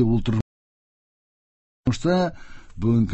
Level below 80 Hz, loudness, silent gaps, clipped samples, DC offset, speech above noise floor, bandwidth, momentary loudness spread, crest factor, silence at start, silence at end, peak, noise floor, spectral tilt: -42 dBFS; -24 LUFS; 0.42-1.84 s; under 0.1%; under 0.1%; over 69 dB; 8.4 kHz; 7 LU; 16 dB; 0 s; 0 s; -10 dBFS; under -90 dBFS; -7.5 dB/octave